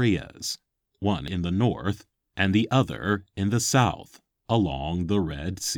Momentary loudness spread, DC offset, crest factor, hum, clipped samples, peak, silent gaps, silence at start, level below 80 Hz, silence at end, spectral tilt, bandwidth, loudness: 10 LU; under 0.1%; 20 dB; none; under 0.1%; -6 dBFS; none; 0 s; -46 dBFS; 0 s; -5 dB/octave; 18.5 kHz; -26 LUFS